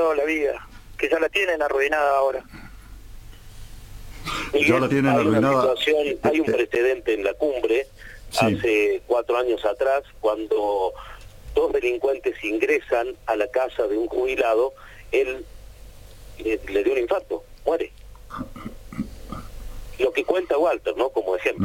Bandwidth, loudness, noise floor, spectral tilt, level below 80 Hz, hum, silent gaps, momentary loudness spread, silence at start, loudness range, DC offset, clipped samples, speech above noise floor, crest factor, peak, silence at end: 17 kHz; -22 LUFS; -43 dBFS; -5.5 dB/octave; -44 dBFS; none; none; 16 LU; 0 s; 7 LU; under 0.1%; under 0.1%; 20 dB; 18 dB; -6 dBFS; 0 s